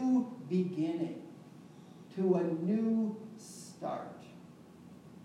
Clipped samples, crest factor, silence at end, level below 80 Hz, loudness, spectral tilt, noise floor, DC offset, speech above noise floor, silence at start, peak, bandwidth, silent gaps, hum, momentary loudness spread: under 0.1%; 18 dB; 0 s; -84 dBFS; -34 LUFS; -8 dB/octave; -54 dBFS; under 0.1%; 22 dB; 0 s; -18 dBFS; 13 kHz; none; none; 23 LU